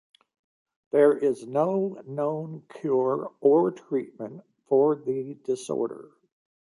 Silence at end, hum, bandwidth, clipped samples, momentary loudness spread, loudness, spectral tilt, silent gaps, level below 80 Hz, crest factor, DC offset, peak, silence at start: 0.65 s; none; 11.5 kHz; under 0.1%; 14 LU; -26 LUFS; -7.5 dB/octave; none; -78 dBFS; 18 dB; under 0.1%; -8 dBFS; 0.95 s